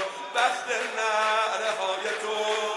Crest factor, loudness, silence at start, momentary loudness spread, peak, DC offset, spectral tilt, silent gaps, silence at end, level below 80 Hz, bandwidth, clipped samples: 16 dB; -26 LUFS; 0 s; 5 LU; -10 dBFS; under 0.1%; 0 dB/octave; none; 0 s; under -90 dBFS; 11.5 kHz; under 0.1%